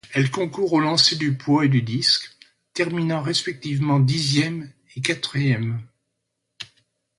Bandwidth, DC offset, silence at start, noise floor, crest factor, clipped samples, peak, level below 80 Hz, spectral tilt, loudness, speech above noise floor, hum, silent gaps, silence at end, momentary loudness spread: 11.5 kHz; under 0.1%; 0.05 s; -77 dBFS; 22 dB; under 0.1%; -2 dBFS; -60 dBFS; -5 dB/octave; -21 LUFS; 56 dB; none; none; 0.55 s; 16 LU